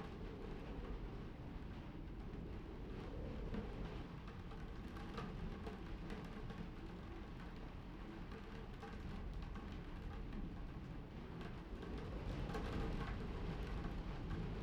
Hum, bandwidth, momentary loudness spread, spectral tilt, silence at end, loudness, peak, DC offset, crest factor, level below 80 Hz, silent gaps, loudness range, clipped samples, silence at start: none; 10.5 kHz; 6 LU; -7.5 dB/octave; 0 s; -50 LUFS; -32 dBFS; under 0.1%; 16 dB; -50 dBFS; none; 4 LU; under 0.1%; 0 s